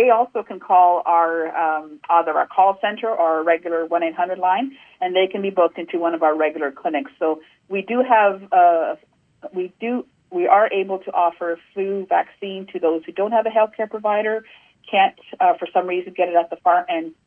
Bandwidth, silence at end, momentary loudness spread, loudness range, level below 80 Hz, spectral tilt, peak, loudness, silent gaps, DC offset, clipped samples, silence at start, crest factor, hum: 3.6 kHz; 0.15 s; 12 LU; 3 LU; -74 dBFS; -7.5 dB/octave; -2 dBFS; -20 LUFS; none; under 0.1%; under 0.1%; 0 s; 18 dB; none